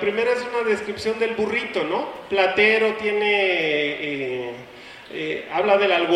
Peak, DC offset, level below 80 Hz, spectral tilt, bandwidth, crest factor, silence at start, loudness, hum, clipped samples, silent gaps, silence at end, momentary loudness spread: -4 dBFS; under 0.1%; -60 dBFS; -4.5 dB/octave; 12 kHz; 18 dB; 0 s; -21 LUFS; none; under 0.1%; none; 0 s; 13 LU